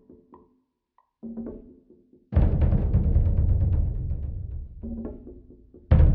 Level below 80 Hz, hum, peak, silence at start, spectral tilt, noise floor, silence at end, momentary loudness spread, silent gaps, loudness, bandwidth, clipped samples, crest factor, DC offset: -26 dBFS; none; -6 dBFS; 1.25 s; -11 dB/octave; -70 dBFS; 0 s; 17 LU; none; -26 LUFS; 3.4 kHz; under 0.1%; 20 dB; under 0.1%